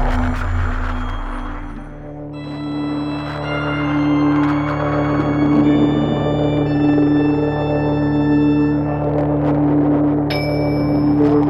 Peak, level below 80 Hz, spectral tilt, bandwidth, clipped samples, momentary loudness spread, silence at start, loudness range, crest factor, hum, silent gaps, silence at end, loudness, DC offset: -4 dBFS; -28 dBFS; -9 dB/octave; 7 kHz; under 0.1%; 13 LU; 0 s; 8 LU; 12 dB; none; none; 0 s; -17 LUFS; 0.5%